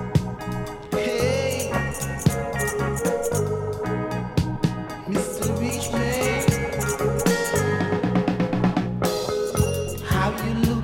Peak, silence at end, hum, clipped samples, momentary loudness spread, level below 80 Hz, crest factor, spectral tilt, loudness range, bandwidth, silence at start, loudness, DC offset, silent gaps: -6 dBFS; 0 s; none; under 0.1%; 5 LU; -38 dBFS; 18 dB; -5.5 dB/octave; 3 LU; 18.5 kHz; 0 s; -24 LUFS; under 0.1%; none